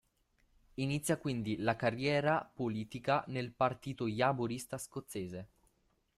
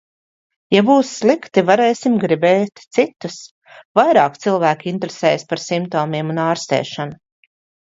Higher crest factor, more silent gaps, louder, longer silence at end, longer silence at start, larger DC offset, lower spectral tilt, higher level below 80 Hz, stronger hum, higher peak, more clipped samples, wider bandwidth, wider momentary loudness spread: about the same, 18 dB vs 18 dB; second, none vs 3.51-3.62 s, 3.85-3.95 s; second, -36 LUFS vs -17 LUFS; about the same, 0.7 s vs 0.8 s; about the same, 0.8 s vs 0.7 s; neither; about the same, -5.5 dB/octave vs -5.5 dB/octave; about the same, -66 dBFS vs -64 dBFS; neither; second, -18 dBFS vs 0 dBFS; neither; first, 14.5 kHz vs 7.8 kHz; about the same, 10 LU vs 10 LU